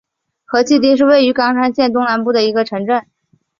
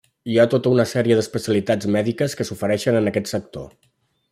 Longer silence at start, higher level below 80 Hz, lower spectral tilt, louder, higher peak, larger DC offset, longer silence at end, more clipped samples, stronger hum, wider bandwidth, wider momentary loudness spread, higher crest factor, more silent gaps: first, 0.5 s vs 0.25 s; about the same, -58 dBFS vs -58 dBFS; second, -4.5 dB/octave vs -6 dB/octave; first, -14 LUFS vs -20 LUFS; about the same, 0 dBFS vs -2 dBFS; neither; about the same, 0.6 s vs 0.65 s; neither; neither; second, 7.4 kHz vs 16 kHz; second, 8 LU vs 11 LU; about the same, 14 dB vs 18 dB; neither